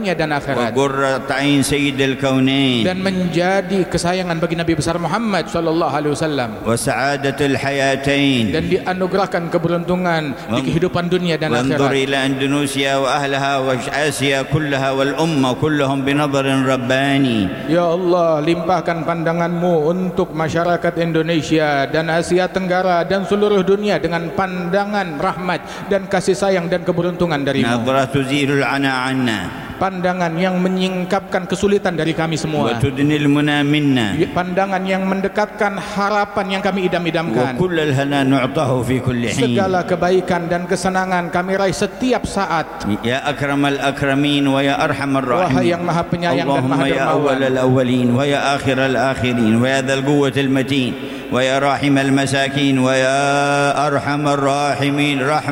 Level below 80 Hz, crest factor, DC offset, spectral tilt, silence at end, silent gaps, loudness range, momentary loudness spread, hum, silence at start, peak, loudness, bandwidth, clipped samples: -44 dBFS; 12 dB; under 0.1%; -5.5 dB/octave; 0 s; none; 2 LU; 4 LU; none; 0 s; -4 dBFS; -17 LUFS; 16.5 kHz; under 0.1%